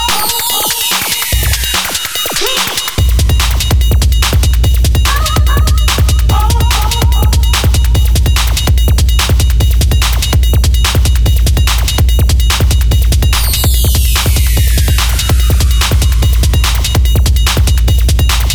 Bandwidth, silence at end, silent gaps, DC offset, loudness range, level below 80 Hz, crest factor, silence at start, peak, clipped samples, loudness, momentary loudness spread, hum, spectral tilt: 19 kHz; 0 s; none; under 0.1%; 1 LU; -10 dBFS; 8 dB; 0 s; 0 dBFS; under 0.1%; -11 LUFS; 1 LU; none; -3.5 dB/octave